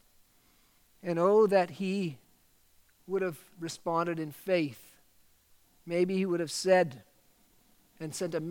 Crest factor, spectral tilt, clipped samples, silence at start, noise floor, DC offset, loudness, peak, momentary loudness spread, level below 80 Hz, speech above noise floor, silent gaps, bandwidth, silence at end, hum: 20 dB; -5.5 dB/octave; under 0.1%; 1.05 s; -66 dBFS; under 0.1%; -30 LUFS; -12 dBFS; 15 LU; -74 dBFS; 36 dB; none; 17.5 kHz; 0 s; none